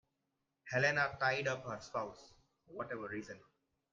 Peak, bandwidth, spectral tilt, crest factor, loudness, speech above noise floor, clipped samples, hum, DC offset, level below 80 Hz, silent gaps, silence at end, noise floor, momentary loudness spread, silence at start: -20 dBFS; 7.8 kHz; -4.5 dB/octave; 20 dB; -37 LUFS; 48 dB; under 0.1%; none; under 0.1%; -74 dBFS; none; 0.55 s; -86 dBFS; 17 LU; 0.65 s